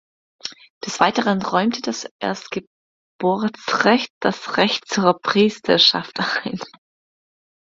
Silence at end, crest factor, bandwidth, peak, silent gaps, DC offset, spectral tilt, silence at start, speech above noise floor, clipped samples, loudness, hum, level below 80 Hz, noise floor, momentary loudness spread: 1 s; 22 dB; 7.8 kHz; 0 dBFS; 0.70-0.81 s, 2.11-2.19 s, 2.67-3.19 s, 4.10-4.21 s; under 0.1%; -4 dB/octave; 0.45 s; over 70 dB; under 0.1%; -19 LUFS; none; -62 dBFS; under -90 dBFS; 17 LU